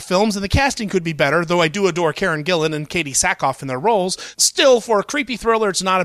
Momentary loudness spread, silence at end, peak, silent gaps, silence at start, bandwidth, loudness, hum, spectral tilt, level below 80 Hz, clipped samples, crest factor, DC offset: 7 LU; 0 s; -2 dBFS; none; 0 s; 15 kHz; -17 LUFS; none; -3.5 dB/octave; -40 dBFS; under 0.1%; 16 dB; under 0.1%